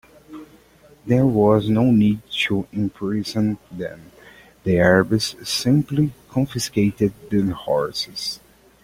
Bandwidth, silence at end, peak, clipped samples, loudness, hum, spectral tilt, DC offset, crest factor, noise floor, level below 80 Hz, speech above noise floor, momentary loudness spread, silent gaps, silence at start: 16.5 kHz; 0.45 s; -2 dBFS; under 0.1%; -20 LUFS; none; -6 dB/octave; under 0.1%; 18 dB; -51 dBFS; -50 dBFS; 31 dB; 15 LU; none; 0.3 s